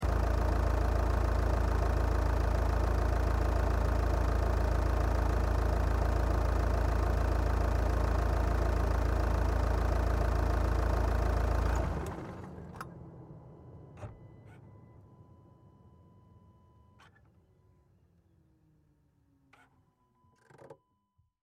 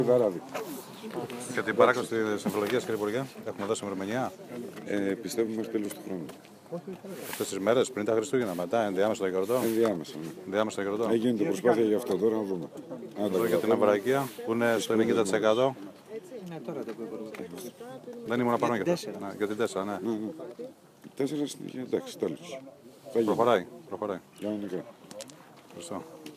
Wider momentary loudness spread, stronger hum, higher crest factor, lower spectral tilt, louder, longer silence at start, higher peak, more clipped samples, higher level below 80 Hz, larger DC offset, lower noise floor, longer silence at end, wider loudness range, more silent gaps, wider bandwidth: about the same, 15 LU vs 17 LU; neither; second, 14 dB vs 22 dB; first, -7 dB/octave vs -5 dB/octave; second, -32 LUFS vs -29 LUFS; about the same, 0 s vs 0 s; second, -18 dBFS vs -6 dBFS; neither; first, -32 dBFS vs -76 dBFS; neither; first, -74 dBFS vs -51 dBFS; first, 0.7 s vs 0 s; first, 15 LU vs 6 LU; neither; second, 13 kHz vs 15.5 kHz